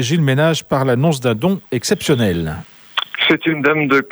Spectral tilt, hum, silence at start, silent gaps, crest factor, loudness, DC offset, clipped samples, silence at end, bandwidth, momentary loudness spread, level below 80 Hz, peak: -5 dB/octave; none; 0 s; none; 12 dB; -16 LUFS; under 0.1%; under 0.1%; 0 s; over 20 kHz; 8 LU; -46 dBFS; -4 dBFS